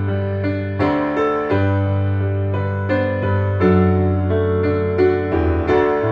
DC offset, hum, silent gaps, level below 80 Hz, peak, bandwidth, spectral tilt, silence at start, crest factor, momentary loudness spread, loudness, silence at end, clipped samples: under 0.1%; none; none; -36 dBFS; -4 dBFS; 4.9 kHz; -10 dB/octave; 0 s; 14 dB; 5 LU; -18 LUFS; 0 s; under 0.1%